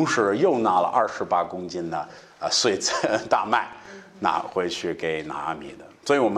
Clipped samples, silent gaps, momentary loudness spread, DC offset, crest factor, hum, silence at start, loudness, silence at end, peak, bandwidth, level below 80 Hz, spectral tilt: under 0.1%; none; 15 LU; under 0.1%; 20 dB; none; 0 s; -24 LUFS; 0 s; -6 dBFS; 12.5 kHz; -64 dBFS; -3.5 dB/octave